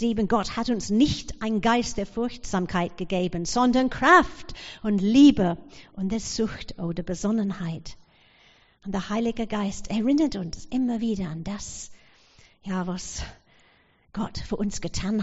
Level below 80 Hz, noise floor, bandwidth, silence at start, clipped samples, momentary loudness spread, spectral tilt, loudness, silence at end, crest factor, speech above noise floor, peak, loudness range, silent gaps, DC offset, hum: -44 dBFS; -61 dBFS; 8 kHz; 0 s; under 0.1%; 18 LU; -4.5 dB/octave; -25 LUFS; 0 s; 20 dB; 36 dB; -6 dBFS; 11 LU; none; under 0.1%; none